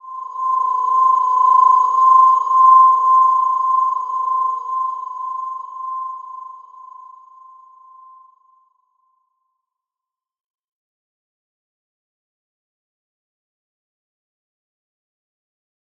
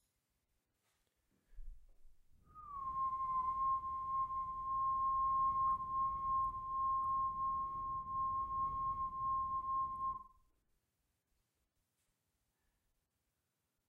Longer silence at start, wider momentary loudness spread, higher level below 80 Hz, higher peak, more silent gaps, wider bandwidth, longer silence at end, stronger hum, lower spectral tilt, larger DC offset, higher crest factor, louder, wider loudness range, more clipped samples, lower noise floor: second, 0.05 s vs 1.5 s; first, 18 LU vs 7 LU; second, under -90 dBFS vs -60 dBFS; first, -2 dBFS vs -28 dBFS; neither; first, 7 kHz vs 3.4 kHz; first, 9 s vs 3.6 s; neither; second, -0.5 dB/octave vs -7.5 dB/octave; neither; about the same, 16 dB vs 12 dB; first, -14 LUFS vs -38 LUFS; first, 20 LU vs 9 LU; neither; about the same, -88 dBFS vs -87 dBFS